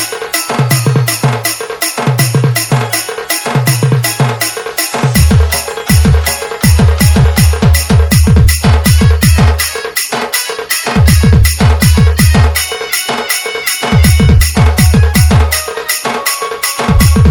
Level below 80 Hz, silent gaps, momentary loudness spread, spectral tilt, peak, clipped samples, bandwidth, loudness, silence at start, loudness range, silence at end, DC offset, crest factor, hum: -16 dBFS; none; 7 LU; -4.5 dB/octave; 0 dBFS; 1%; over 20 kHz; -10 LUFS; 0 s; 3 LU; 0 s; under 0.1%; 8 dB; none